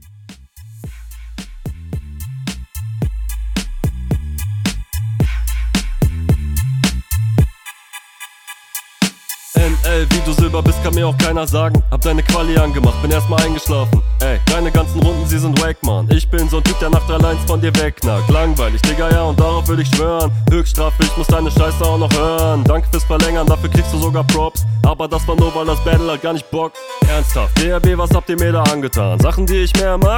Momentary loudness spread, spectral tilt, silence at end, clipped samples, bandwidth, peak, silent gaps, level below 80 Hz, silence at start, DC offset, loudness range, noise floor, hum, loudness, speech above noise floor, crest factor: 13 LU; -5.5 dB/octave; 0 s; under 0.1%; 18.5 kHz; -2 dBFS; none; -18 dBFS; 0.25 s; under 0.1%; 7 LU; -39 dBFS; none; -15 LUFS; 26 dB; 14 dB